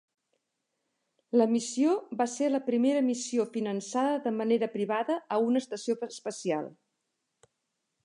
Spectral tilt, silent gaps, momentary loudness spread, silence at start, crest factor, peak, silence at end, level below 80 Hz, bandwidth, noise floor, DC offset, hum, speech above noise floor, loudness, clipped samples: -4.5 dB/octave; none; 7 LU; 1.35 s; 18 dB; -14 dBFS; 1.35 s; -86 dBFS; 11 kHz; -82 dBFS; under 0.1%; none; 54 dB; -29 LUFS; under 0.1%